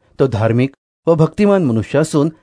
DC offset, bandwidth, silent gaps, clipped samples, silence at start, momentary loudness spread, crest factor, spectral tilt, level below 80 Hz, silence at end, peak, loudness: under 0.1%; 11 kHz; 0.78-1.03 s; under 0.1%; 0.2 s; 5 LU; 14 dB; -7.5 dB/octave; -46 dBFS; 0.1 s; -2 dBFS; -15 LUFS